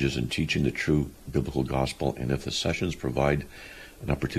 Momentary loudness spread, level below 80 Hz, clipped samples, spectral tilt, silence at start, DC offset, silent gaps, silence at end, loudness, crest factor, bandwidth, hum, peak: 7 LU; -42 dBFS; under 0.1%; -5.5 dB/octave; 0 s; under 0.1%; none; 0 s; -28 LUFS; 18 dB; 14.5 kHz; none; -8 dBFS